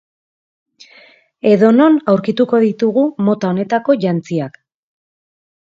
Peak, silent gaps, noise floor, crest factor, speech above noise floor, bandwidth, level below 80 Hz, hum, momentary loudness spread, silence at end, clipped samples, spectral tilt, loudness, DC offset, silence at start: 0 dBFS; none; -46 dBFS; 16 dB; 33 dB; 7.6 kHz; -64 dBFS; none; 9 LU; 1.2 s; under 0.1%; -8 dB/octave; -14 LUFS; under 0.1%; 1.45 s